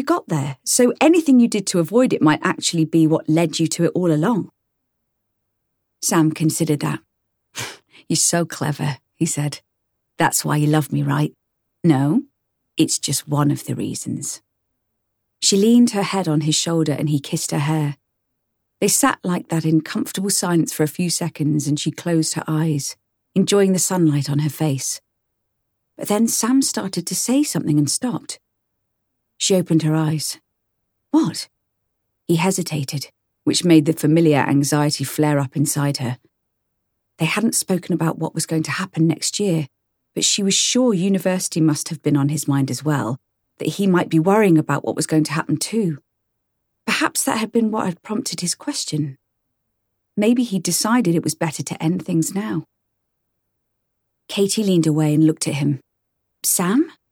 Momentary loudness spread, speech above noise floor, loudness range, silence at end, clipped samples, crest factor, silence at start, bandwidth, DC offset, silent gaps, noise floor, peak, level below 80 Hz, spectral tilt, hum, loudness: 10 LU; 56 dB; 5 LU; 0.2 s; under 0.1%; 18 dB; 0 s; 19 kHz; under 0.1%; none; -74 dBFS; -2 dBFS; -66 dBFS; -4.5 dB/octave; none; -19 LUFS